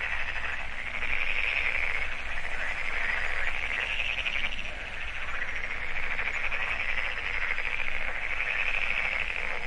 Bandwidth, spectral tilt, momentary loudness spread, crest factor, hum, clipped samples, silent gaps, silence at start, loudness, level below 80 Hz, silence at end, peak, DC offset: 9.2 kHz; -2.5 dB/octave; 7 LU; 16 dB; none; under 0.1%; none; 0 s; -30 LUFS; -38 dBFS; 0 s; -14 dBFS; under 0.1%